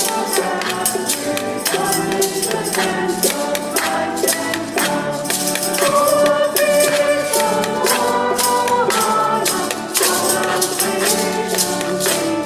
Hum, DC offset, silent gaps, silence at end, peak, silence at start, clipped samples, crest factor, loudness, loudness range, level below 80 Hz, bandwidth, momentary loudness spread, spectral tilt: none; under 0.1%; none; 0 s; 0 dBFS; 0 s; under 0.1%; 16 dB; -17 LUFS; 3 LU; -54 dBFS; 16 kHz; 5 LU; -2 dB/octave